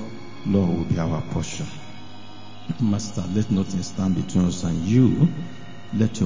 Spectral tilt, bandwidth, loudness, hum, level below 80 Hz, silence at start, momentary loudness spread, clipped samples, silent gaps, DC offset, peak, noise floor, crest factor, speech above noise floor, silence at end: -7 dB/octave; 7.6 kHz; -23 LUFS; none; -44 dBFS; 0 s; 21 LU; under 0.1%; none; 2%; -6 dBFS; -42 dBFS; 16 dB; 20 dB; 0 s